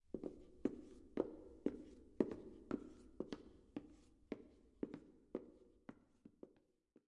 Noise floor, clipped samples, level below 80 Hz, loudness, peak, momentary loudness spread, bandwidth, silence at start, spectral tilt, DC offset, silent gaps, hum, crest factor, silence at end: -76 dBFS; under 0.1%; -72 dBFS; -49 LUFS; -20 dBFS; 20 LU; 10.5 kHz; 0.1 s; -7.5 dB/octave; under 0.1%; none; none; 30 dB; 0.55 s